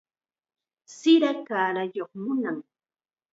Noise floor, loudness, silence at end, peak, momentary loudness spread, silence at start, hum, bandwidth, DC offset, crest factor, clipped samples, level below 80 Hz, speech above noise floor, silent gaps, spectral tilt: under -90 dBFS; -25 LUFS; 0.7 s; -8 dBFS; 13 LU; 0.9 s; none; 7.8 kHz; under 0.1%; 20 dB; under 0.1%; -84 dBFS; over 66 dB; none; -5 dB/octave